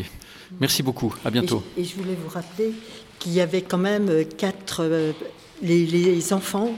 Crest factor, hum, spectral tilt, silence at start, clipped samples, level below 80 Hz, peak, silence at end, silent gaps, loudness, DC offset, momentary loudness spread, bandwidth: 18 dB; none; -5 dB/octave; 0 s; under 0.1%; -56 dBFS; -6 dBFS; 0 s; none; -23 LUFS; under 0.1%; 15 LU; 17 kHz